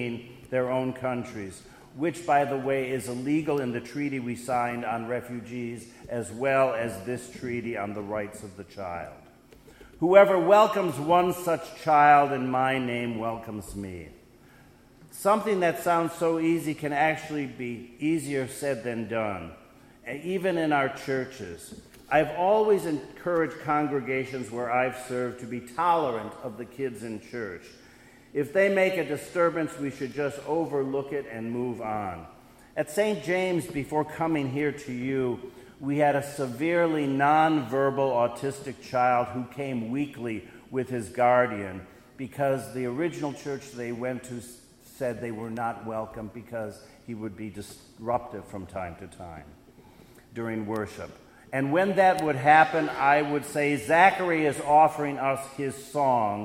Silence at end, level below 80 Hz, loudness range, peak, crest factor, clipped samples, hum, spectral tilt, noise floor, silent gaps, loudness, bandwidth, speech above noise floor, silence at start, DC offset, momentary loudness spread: 0 s; -60 dBFS; 12 LU; -4 dBFS; 24 dB; under 0.1%; none; -6 dB/octave; -54 dBFS; none; -27 LUFS; 16 kHz; 28 dB; 0 s; under 0.1%; 17 LU